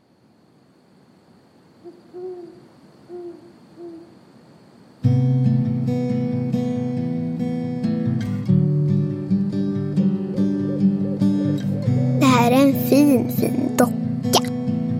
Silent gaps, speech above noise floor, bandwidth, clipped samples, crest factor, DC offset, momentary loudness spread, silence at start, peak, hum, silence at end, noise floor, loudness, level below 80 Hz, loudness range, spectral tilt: none; 35 dB; 16.5 kHz; under 0.1%; 20 dB; under 0.1%; 20 LU; 1.85 s; 0 dBFS; none; 0 s; -56 dBFS; -20 LUFS; -58 dBFS; 22 LU; -7 dB/octave